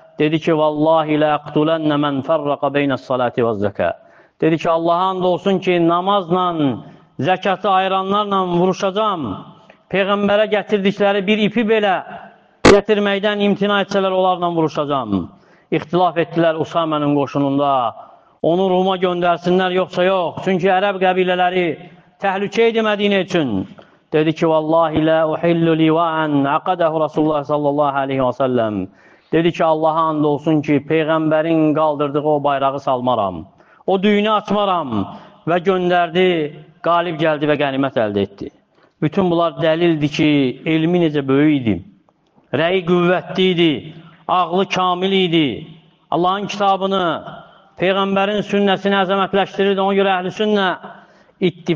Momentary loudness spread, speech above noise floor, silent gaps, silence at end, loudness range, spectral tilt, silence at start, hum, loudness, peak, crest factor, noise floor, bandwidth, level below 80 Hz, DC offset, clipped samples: 7 LU; 40 dB; none; 0 s; 2 LU; -6.5 dB/octave; 0.2 s; none; -17 LUFS; 0 dBFS; 16 dB; -56 dBFS; 8.8 kHz; -52 dBFS; under 0.1%; under 0.1%